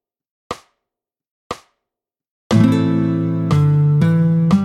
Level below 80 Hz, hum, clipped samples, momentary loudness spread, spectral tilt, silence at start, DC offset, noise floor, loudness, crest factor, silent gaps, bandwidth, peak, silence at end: -50 dBFS; none; under 0.1%; 18 LU; -8.5 dB/octave; 0.5 s; under 0.1%; -85 dBFS; -15 LUFS; 16 dB; 1.31-1.50 s, 2.30-2.50 s; 10 kHz; -2 dBFS; 0 s